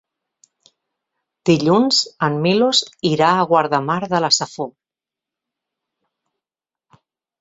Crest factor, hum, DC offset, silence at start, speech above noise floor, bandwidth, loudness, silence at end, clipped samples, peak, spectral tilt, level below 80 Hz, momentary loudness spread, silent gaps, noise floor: 18 dB; none; under 0.1%; 1.45 s; 73 dB; 8 kHz; -17 LUFS; 2.7 s; under 0.1%; -2 dBFS; -4 dB/octave; -62 dBFS; 8 LU; none; -90 dBFS